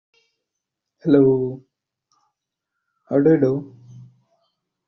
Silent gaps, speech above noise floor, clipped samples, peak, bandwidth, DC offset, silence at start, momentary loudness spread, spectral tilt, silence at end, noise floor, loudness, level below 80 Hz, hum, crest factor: none; 66 dB; under 0.1%; -2 dBFS; 6 kHz; under 0.1%; 1.05 s; 16 LU; -9.5 dB/octave; 0.85 s; -82 dBFS; -19 LUFS; -62 dBFS; none; 20 dB